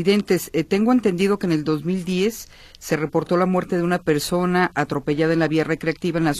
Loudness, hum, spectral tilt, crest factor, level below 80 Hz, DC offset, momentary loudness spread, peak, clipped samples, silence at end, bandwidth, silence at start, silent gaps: -21 LUFS; none; -6 dB/octave; 14 dB; -50 dBFS; under 0.1%; 5 LU; -6 dBFS; under 0.1%; 0 s; 14.5 kHz; 0 s; none